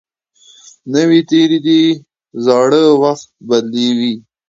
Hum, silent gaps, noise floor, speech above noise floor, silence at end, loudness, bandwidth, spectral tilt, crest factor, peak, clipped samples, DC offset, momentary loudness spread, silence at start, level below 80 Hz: none; none; -48 dBFS; 37 dB; 0.3 s; -13 LUFS; 7.8 kHz; -5.5 dB/octave; 14 dB; 0 dBFS; under 0.1%; under 0.1%; 11 LU; 0.85 s; -62 dBFS